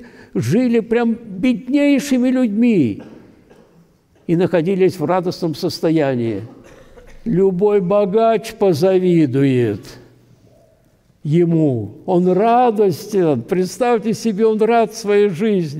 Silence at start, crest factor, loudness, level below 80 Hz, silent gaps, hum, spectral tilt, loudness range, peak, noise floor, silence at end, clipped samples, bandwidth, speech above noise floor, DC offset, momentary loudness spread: 0 s; 10 dB; -16 LUFS; -52 dBFS; none; none; -7 dB/octave; 3 LU; -6 dBFS; -55 dBFS; 0 s; under 0.1%; 16 kHz; 39 dB; under 0.1%; 7 LU